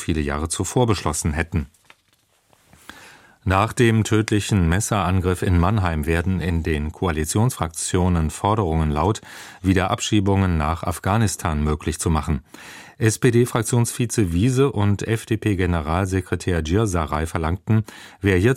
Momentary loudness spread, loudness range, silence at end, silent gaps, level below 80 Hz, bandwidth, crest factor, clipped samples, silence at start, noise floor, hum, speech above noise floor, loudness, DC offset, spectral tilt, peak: 6 LU; 3 LU; 0 s; none; -34 dBFS; 16 kHz; 18 dB; under 0.1%; 0 s; -63 dBFS; none; 42 dB; -21 LUFS; under 0.1%; -5.5 dB/octave; -2 dBFS